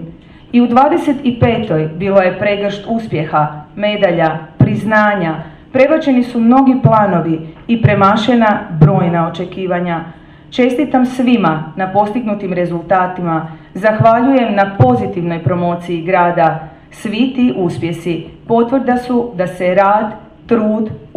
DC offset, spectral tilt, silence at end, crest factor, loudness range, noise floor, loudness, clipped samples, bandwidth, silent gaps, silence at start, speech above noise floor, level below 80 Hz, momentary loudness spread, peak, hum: under 0.1%; -8 dB/octave; 0.1 s; 12 dB; 4 LU; -34 dBFS; -13 LUFS; under 0.1%; 11 kHz; none; 0 s; 21 dB; -42 dBFS; 10 LU; 0 dBFS; none